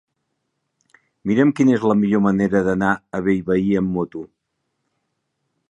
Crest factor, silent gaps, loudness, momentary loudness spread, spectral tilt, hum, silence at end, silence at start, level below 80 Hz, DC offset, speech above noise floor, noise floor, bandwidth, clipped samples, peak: 18 dB; none; -19 LUFS; 9 LU; -8 dB/octave; none; 1.45 s; 1.25 s; -52 dBFS; under 0.1%; 57 dB; -75 dBFS; 10 kHz; under 0.1%; -2 dBFS